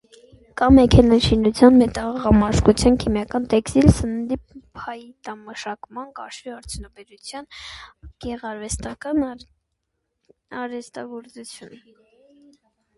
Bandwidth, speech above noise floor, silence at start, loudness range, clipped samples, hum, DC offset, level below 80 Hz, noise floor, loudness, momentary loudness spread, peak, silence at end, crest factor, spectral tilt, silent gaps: 11.5 kHz; 57 dB; 0.55 s; 19 LU; under 0.1%; none; under 0.1%; -34 dBFS; -77 dBFS; -18 LUFS; 23 LU; 0 dBFS; 1.3 s; 20 dB; -6.5 dB/octave; none